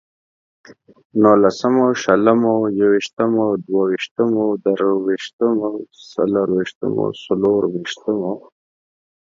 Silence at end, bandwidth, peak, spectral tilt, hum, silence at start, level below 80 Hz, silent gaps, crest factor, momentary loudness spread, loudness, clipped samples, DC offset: 0.85 s; 7.6 kHz; 0 dBFS; -6.5 dB/octave; none; 0.7 s; -60 dBFS; 1.05-1.10 s, 3.13-3.17 s, 4.11-4.16 s, 5.33-5.39 s, 6.75-6.81 s; 18 dB; 9 LU; -18 LUFS; under 0.1%; under 0.1%